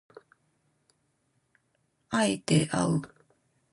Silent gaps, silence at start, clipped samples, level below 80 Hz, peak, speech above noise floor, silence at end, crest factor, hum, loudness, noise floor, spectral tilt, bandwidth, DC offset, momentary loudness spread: none; 2.1 s; under 0.1%; -64 dBFS; -12 dBFS; 48 dB; 0.65 s; 20 dB; none; -27 LUFS; -74 dBFS; -5 dB/octave; 11.5 kHz; under 0.1%; 7 LU